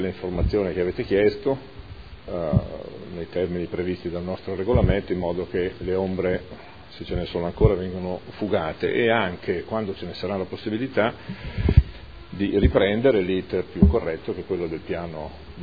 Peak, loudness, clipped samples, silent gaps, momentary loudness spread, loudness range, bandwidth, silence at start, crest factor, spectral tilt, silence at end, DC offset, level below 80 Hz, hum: 0 dBFS; -24 LUFS; under 0.1%; none; 15 LU; 4 LU; 5 kHz; 0 s; 24 dB; -9.5 dB/octave; 0 s; 0.4%; -32 dBFS; none